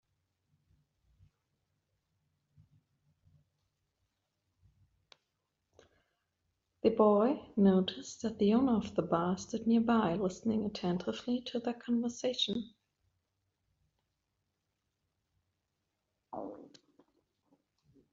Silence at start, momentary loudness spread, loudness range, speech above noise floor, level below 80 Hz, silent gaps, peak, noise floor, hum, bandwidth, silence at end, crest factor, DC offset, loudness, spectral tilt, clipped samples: 6.85 s; 12 LU; 23 LU; 54 dB; -70 dBFS; none; -14 dBFS; -85 dBFS; none; 7.6 kHz; 1.5 s; 22 dB; under 0.1%; -32 LUFS; -5.5 dB/octave; under 0.1%